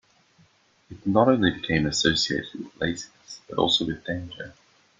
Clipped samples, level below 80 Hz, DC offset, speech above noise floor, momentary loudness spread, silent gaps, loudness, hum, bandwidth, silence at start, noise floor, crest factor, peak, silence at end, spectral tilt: under 0.1%; -52 dBFS; under 0.1%; 36 dB; 19 LU; none; -24 LUFS; none; 9.6 kHz; 0.9 s; -61 dBFS; 22 dB; -4 dBFS; 0.5 s; -4 dB/octave